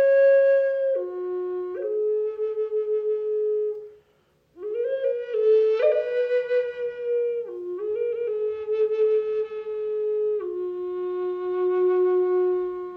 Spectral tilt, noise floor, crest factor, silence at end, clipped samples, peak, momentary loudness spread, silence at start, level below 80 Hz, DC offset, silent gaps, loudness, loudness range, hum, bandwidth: -6.5 dB/octave; -64 dBFS; 14 dB; 0 s; under 0.1%; -10 dBFS; 10 LU; 0 s; -72 dBFS; under 0.1%; none; -24 LUFS; 3 LU; none; 5.2 kHz